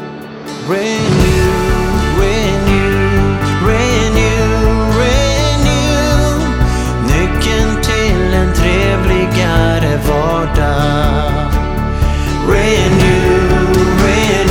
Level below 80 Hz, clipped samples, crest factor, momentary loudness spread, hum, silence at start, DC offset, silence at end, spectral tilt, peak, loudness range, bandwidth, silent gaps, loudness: -16 dBFS; under 0.1%; 12 dB; 4 LU; none; 0 s; under 0.1%; 0 s; -5.5 dB/octave; 0 dBFS; 1 LU; 17.5 kHz; none; -12 LUFS